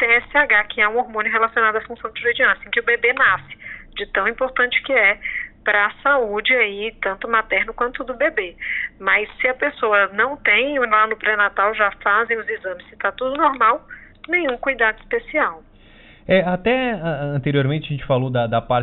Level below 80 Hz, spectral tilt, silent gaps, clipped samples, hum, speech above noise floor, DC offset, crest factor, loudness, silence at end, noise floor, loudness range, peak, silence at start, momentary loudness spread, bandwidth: -48 dBFS; -2.5 dB/octave; none; under 0.1%; none; 27 dB; under 0.1%; 16 dB; -18 LUFS; 0 s; -46 dBFS; 3 LU; -4 dBFS; 0 s; 9 LU; 4.2 kHz